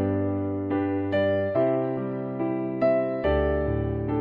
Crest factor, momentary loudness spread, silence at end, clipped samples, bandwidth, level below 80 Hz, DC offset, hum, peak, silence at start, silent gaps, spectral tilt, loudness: 14 dB; 5 LU; 0 s; under 0.1%; 5 kHz; -40 dBFS; under 0.1%; none; -12 dBFS; 0 s; none; -10.5 dB/octave; -26 LUFS